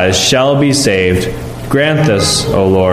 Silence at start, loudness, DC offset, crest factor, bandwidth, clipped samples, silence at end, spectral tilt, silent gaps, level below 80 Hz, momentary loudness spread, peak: 0 s; -11 LUFS; under 0.1%; 10 dB; 15.5 kHz; under 0.1%; 0 s; -4 dB/octave; none; -32 dBFS; 7 LU; 0 dBFS